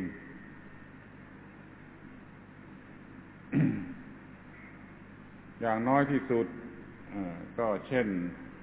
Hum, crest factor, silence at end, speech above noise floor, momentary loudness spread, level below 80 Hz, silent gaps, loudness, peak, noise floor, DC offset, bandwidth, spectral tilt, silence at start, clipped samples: 50 Hz at -55 dBFS; 24 dB; 0 s; 21 dB; 22 LU; -62 dBFS; none; -32 LUFS; -12 dBFS; -51 dBFS; under 0.1%; 4 kHz; -7 dB/octave; 0 s; under 0.1%